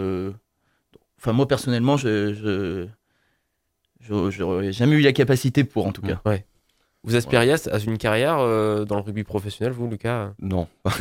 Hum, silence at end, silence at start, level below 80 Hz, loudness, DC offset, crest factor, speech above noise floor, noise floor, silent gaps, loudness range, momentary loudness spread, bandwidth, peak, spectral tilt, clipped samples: none; 0 s; 0 s; -52 dBFS; -22 LUFS; under 0.1%; 20 dB; 53 dB; -74 dBFS; none; 4 LU; 10 LU; 16.5 kHz; -2 dBFS; -6.5 dB/octave; under 0.1%